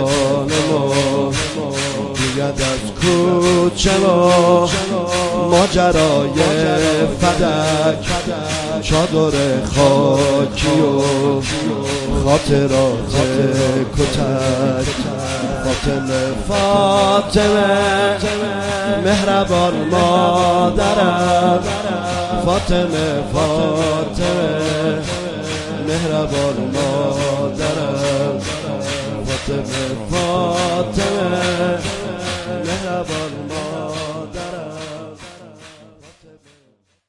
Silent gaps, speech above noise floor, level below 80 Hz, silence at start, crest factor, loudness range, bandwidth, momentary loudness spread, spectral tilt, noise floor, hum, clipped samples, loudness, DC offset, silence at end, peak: none; 43 dB; -34 dBFS; 0 s; 16 dB; 6 LU; 11.5 kHz; 9 LU; -5 dB/octave; -58 dBFS; none; under 0.1%; -16 LUFS; under 0.1%; 1.25 s; 0 dBFS